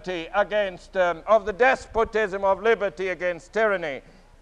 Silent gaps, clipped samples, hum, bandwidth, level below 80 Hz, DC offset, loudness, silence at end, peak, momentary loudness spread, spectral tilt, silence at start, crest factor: none; under 0.1%; none; 10 kHz; -48 dBFS; under 0.1%; -24 LUFS; 0.4 s; -6 dBFS; 7 LU; -4.5 dB/octave; 0 s; 16 dB